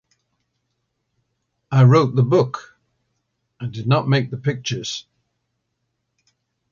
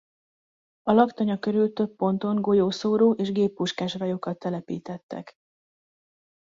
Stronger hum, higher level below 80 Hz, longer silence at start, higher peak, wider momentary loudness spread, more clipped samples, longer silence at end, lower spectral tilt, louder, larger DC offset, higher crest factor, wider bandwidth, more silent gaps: neither; first, -60 dBFS vs -66 dBFS; first, 1.7 s vs 0.85 s; first, -2 dBFS vs -6 dBFS; first, 18 LU vs 13 LU; neither; first, 1.7 s vs 1.15 s; about the same, -6.5 dB/octave vs -7 dB/octave; first, -18 LUFS vs -25 LUFS; neither; about the same, 20 dB vs 20 dB; about the same, 7.4 kHz vs 7.6 kHz; second, none vs 5.03-5.09 s